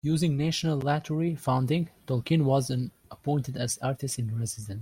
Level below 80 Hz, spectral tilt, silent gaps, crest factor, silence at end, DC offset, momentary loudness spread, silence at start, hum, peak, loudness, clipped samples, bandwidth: -58 dBFS; -6 dB/octave; none; 16 dB; 0 s; under 0.1%; 7 LU; 0.05 s; none; -12 dBFS; -28 LUFS; under 0.1%; 16.5 kHz